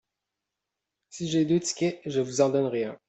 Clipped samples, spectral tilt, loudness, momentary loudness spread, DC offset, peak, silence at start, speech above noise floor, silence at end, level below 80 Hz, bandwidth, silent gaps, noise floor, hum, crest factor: under 0.1%; -5 dB/octave; -27 LUFS; 7 LU; under 0.1%; -10 dBFS; 1.15 s; 60 dB; 0.15 s; -68 dBFS; 8.4 kHz; none; -86 dBFS; none; 20 dB